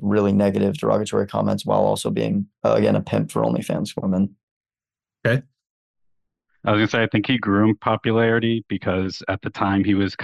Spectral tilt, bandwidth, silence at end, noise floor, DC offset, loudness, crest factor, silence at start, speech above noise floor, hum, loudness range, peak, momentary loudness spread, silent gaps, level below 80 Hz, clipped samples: -6.5 dB/octave; 12.5 kHz; 0 s; under -90 dBFS; under 0.1%; -21 LUFS; 18 dB; 0 s; over 70 dB; none; 5 LU; -4 dBFS; 6 LU; 4.43-4.61 s, 5.70-5.94 s; -58 dBFS; under 0.1%